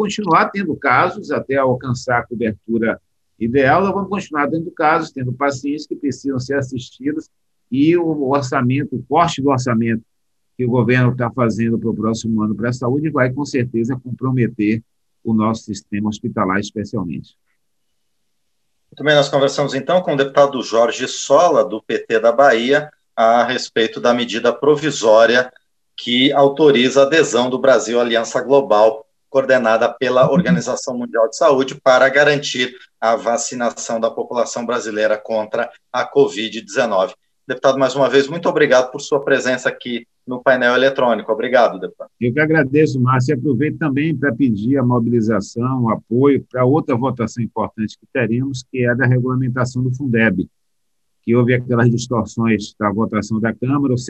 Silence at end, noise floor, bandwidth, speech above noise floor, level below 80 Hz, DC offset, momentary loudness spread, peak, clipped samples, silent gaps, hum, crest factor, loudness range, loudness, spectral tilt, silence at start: 0 s; -75 dBFS; 8.6 kHz; 59 dB; -54 dBFS; under 0.1%; 10 LU; 0 dBFS; under 0.1%; none; none; 16 dB; 6 LU; -17 LUFS; -5.5 dB/octave; 0 s